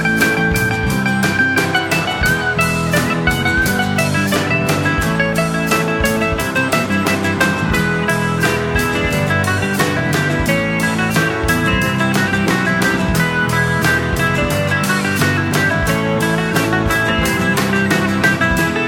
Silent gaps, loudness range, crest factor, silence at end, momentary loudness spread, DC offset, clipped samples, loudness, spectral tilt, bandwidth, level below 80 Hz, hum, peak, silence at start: none; 1 LU; 14 dB; 0 s; 2 LU; under 0.1%; under 0.1%; -15 LUFS; -5 dB/octave; 18 kHz; -32 dBFS; none; 0 dBFS; 0 s